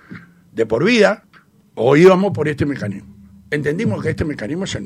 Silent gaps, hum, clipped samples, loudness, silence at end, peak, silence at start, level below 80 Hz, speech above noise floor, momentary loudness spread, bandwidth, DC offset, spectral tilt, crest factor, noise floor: none; none; under 0.1%; -17 LUFS; 0 s; 0 dBFS; 0.1 s; -46 dBFS; 23 dB; 17 LU; 11.5 kHz; under 0.1%; -6.5 dB/octave; 16 dB; -39 dBFS